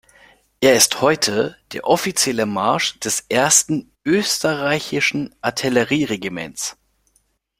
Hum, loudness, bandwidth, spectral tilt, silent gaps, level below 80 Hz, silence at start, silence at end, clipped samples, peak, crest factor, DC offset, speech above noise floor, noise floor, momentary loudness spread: none; -18 LUFS; 16.5 kHz; -2.5 dB/octave; none; -56 dBFS; 0.6 s; 0.9 s; under 0.1%; 0 dBFS; 20 dB; under 0.1%; 46 dB; -64 dBFS; 12 LU